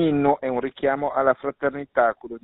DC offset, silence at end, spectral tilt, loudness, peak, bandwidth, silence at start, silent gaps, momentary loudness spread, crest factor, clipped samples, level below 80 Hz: under 0.1%; 0.05 s; -5.5 dB/octave; -23 LUFS; -6 dBFS; 4.1 kHz; 0 s; none; 5 LU; 18 dB; under 0.1%; -56 dBFS